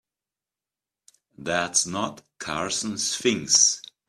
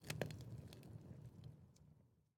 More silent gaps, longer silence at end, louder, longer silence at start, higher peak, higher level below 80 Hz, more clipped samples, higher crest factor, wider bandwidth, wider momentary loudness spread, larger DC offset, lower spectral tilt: neither; about the same, 0.25 s vs 0.15 s; first, -22 LUFS vs -54 LUFS; first, 1.4 s vs 0 s; first, -6 dBFS vs -24 dBFS; first, -64 dBFS vs -72 dBFS; neither; second, 22 dB vs 30 dB; second, 14 kHz vs 18 kHz; second, 15 LU vs 19 LU; neither; second, -1 dB/octave vs -5 dB/octave